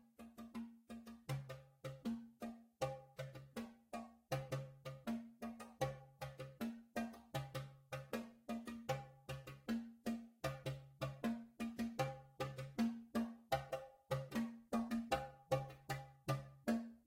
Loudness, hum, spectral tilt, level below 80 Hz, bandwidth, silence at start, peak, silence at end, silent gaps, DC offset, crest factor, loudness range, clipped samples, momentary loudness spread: -47 LUFS; none; -6 dB/octave; -68 dBFS; 16 kHz; 0.2 s; -24 dBFS; 0.1 s; none; under 0.1%; 22 dB; 5 LU; under 0.1%; 10 LU